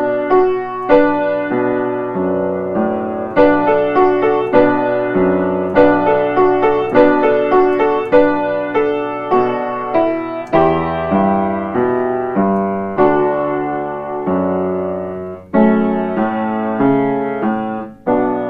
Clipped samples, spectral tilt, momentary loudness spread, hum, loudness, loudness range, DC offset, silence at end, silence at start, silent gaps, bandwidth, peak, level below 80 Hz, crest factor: under 0.1%; -9 dB/octave; 7 LU; none; -15 LUFS; 4 LU; under 0.1%; 0 s; 0 s; none; 5.4 kHz; 0 dBFS; -44 dBFS; 14 dB